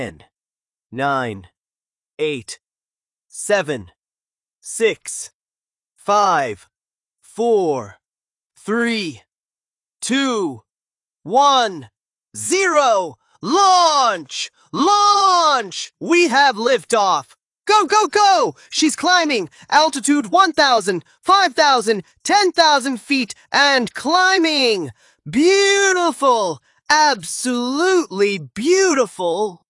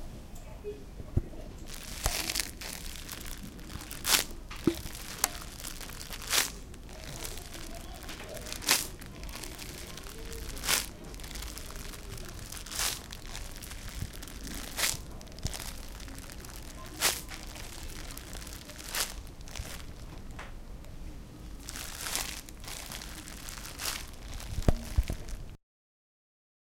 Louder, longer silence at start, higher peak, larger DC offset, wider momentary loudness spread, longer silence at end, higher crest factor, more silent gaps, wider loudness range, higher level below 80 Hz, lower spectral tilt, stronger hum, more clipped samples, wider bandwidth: first, -16 LUFS vs -35 LUFS; about the same, 0 s vs 0 s; about the same, -2 dBFS vs -2 dBFS; neither; about the same, 15 LU vs 17 LU; second, 0.15 s vs 1.15 s; second, 16 dB vs 34 dB; first, 5.35-5.41 s, 8.46-8.50 s, 9.40-9.44 s vs none; about the same, 9 LU vs 7 LU; second, -64 dBFS vs -42 dBFS; about the same, -2.5 dB/octave vs -2 dB/octave; neither; neither; second, 11.5 kHz vs 17 kHz